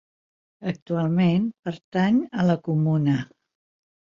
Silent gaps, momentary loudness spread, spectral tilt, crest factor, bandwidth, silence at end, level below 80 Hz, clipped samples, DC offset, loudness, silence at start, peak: 0.82-0.86 s, 1.59-1.63 s, 1.84-1.92 s; 11 LU; -8.5 dB/octave; 16 dB; 7.2 kHz; 0.9 s; -62 dBFS; under 0.1%; under 0.1%; -23 LUFS; 0.6 s; -10 dBFS